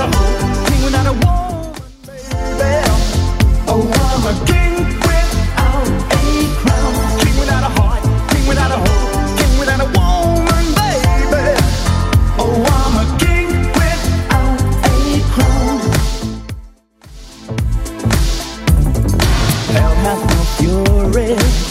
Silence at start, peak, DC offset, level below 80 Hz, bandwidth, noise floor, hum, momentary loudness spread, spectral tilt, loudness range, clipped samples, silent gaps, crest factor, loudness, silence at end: 0 s; 0 dBFS; under 0.1%; -16 dBFS; 16 kHz; -39 dBFS; none; 6 LU; -5.5 dB/octave; 3 LU; under 0.1%; none; 12 dB; -14 LUFS; 0 s